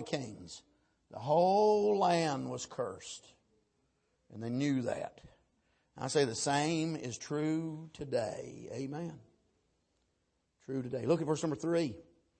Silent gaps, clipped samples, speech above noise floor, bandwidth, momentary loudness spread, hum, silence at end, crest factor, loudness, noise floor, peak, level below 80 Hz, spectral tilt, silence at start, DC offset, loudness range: none; under 0.1%; 46 dB; 8.8 kHz; 17 LU; none; 0.4 s; 18 dB; -34 LUFS; -79 dBFS; -18 dBFS; -72 dBFS; -5 dB/octave; 0 s; under 0.1%; 8 LU